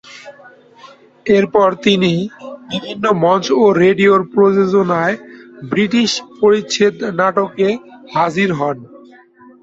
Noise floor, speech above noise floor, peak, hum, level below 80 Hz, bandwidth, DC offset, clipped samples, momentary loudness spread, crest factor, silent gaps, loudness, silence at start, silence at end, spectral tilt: -44 dBFS; 29 dB; 0 dBFS; none; -56 dBFS; 7.8 kHz; under 0.1%; under 0.1%; 14 LU; 16 dB; none; -14 LUFS; 0.05 s; 0.75 s; -5.5 dB/octave